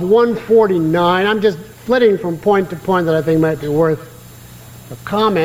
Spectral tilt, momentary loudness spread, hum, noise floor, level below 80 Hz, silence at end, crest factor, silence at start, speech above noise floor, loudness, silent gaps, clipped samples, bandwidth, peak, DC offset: -7 dB/octave; 7 LU; none; -37 dBFS; -50 dBFS; 0 s; 12 dB; 0 s; 23 dB; -15 LUFS; none; under 0.1%; 16.5 kHz; -2 dBFS; under 0.1%